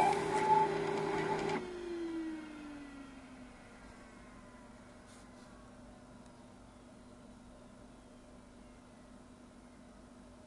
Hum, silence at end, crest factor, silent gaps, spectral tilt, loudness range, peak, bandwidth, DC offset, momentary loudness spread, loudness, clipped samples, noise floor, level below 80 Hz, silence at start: none; 0 s; 22 dB; none; -5 dB/octave; 20 LU; -18 dBFS; 11.5 kHz; under 0.1%; 24 LU; -36 LUFS; under 0.1%; -56 dBFS; -64 dBFS; 0 s